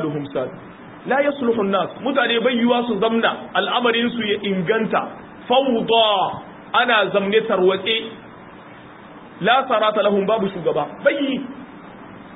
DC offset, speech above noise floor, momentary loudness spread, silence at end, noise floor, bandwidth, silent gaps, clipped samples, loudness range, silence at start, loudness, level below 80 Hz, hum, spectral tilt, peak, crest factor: under 0.1%; 22 dB; 18 LU; 0 s; -40 dBFS; 4 kHz; none; under 0.1%; 2 LU; 0 s; -19 LUFS; -60 dBFS; none; -10 dB/octave; -2 dBFS; 18 dB